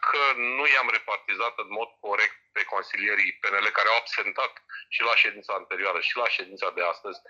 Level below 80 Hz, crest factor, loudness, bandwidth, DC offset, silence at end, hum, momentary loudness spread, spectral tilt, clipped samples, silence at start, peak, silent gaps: -84 dBFS; 18 dB; -25 LUFS; 7.8 kHz; under 0.1%; 0.1 s; none; 11 LU; -1 dB/octave; under 0.1%; 0 s; -8 dBFS; none